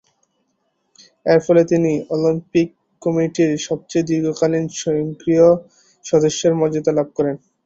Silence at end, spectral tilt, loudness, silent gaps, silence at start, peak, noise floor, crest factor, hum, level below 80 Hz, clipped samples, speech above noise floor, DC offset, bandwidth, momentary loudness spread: 0.3 s; -6 dB/octave; -18 LUFS; none; 1.25 s; -2 dBFS; -69 dBFS; 16 dB; none; -56 dBFS; under 0.1%; 52 dB; under 0.1%; 8 kHz; 8 LU